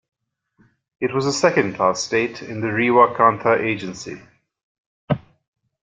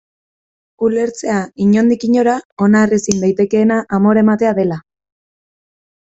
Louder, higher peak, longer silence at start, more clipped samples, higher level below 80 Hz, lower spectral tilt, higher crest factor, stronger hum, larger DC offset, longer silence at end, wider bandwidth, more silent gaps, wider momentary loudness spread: second, -19 LUFS vs -14 LUFS; about the same, -2 dBFS vs 0 dBFS; first, 1 s vs 0.8 s; neither; second, -58 dBFS vs -52 dBFS; second, -5 dB/octave vs -6.5 dB/octave; first, 20 dB vs 14 dB; neither; neither; second, 0.65 s vs 1.3 s; first, 9.4 kHz vs 8 kHz; first, 4.63-5.08 s vs 2.45-2.57 s; first, 13 LU vs 7 LU